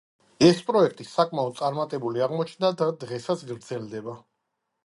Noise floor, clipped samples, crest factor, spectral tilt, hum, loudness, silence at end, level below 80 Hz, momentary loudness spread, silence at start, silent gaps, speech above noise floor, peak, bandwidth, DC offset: -80 dBFS; under 0.1%; 22 dB; -6 dB/octave; none; -25 LUFS; 0.65 s; -66 dBFS; 15 LU; 0.4 s; none; 55 dB; -4 dBFS; 11.5 kHz; under 0.1%